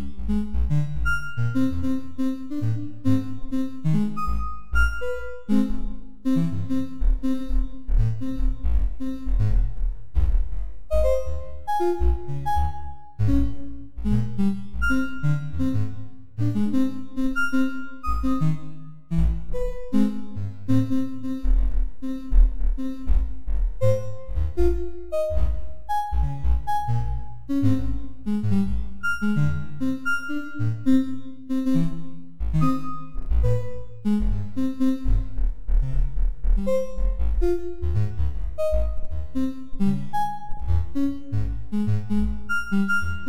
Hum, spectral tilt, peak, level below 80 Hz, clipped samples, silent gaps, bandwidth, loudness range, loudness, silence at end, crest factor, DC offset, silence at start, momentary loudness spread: none; -8.5 dB/octave; -4 dBFS; -28 dBFS; under 0.1%; none; 13 kHz; 2 LU; -26 LUFS; 0 s; 18 dB; 6%; 0 s; 8 LU